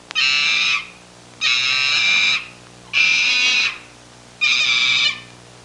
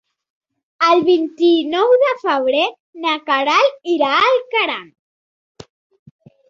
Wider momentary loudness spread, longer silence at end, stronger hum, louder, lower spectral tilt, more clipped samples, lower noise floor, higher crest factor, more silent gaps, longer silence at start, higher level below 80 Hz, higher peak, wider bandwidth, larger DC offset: about the same, 8 LU vs 7 LU; second, 0.35 s vs 1.65 s; first, 60 Hz at -50 dBFS vs none; about the same, -15 LUFS vs -16 LUFS; second, 1.5 dB/octave vs -3.5 dB/octave; neither; second, -44 dBFS vs under -90 dBFS; about the same, 16 dB vs 16 dB; second, none vs 2.80-2.93 s; second, 0.15 s vs 0.8 s; first, -60 dBFS vs -66 dBFS; about the same, -4 dBFS vs -2 dBFS; first, 11.5 kHz vs 7.4 kHz; neither